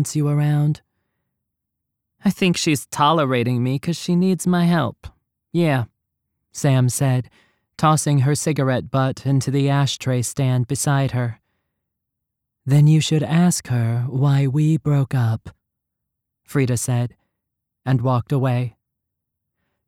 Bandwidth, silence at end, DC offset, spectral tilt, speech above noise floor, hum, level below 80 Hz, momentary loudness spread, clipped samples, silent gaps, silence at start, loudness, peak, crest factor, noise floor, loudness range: 16 kHz; 1.15 s; under 0.1%; -6 dB/octave; 62 dB; none; -54 dBFS; 8 LU; under 0.1%; none; 0 s; -20 LUFS; -4 dBFS; 16 dB; -80 dBFS; 5 LU